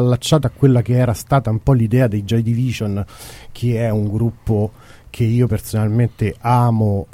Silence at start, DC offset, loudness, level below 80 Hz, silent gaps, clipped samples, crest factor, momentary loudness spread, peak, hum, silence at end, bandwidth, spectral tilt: 0 s; under 0.1%; -17 LUFS; -38 dBFS; none; under 0.1%; 16 dB; 9 LU; 0 dBFS; none; 0.1 s; 15.5 kHz; -7.5 dB/octave